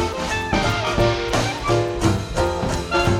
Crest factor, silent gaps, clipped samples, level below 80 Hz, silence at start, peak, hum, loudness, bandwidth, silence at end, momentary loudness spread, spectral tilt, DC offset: 16 dB; none; under 0.1%; -32 dBFS; 0 s; -4 dBFS; none; -21 LUFS; 16 kHz; 0 s; 3 LU; -5 dB/octave; under 0.1%